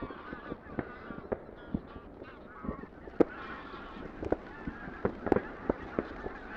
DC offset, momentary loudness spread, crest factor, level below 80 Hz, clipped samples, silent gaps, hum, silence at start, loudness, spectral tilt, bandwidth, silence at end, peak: under 0.1%; 14 LU; 30 dB; -52 dBFS; under 0.1%; none; none; 0 s; -37 LUFS; -8.5 dB/octave; 7.6 kHz; 0 s; -8 dBFS